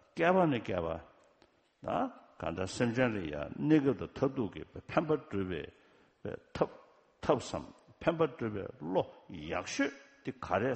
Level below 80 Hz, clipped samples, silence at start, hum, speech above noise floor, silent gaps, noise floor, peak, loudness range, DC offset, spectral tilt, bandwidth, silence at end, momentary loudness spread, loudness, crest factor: -60 dBFS; under 0.1%; 0.15 s; none; 35 dB; none; -68 dBFS; -12 dBFS; 4 LU; under 0.1%; -6 dB/octave; 8.4 kHz; 0 s; 16 LU; -34 LUFS; 22 dB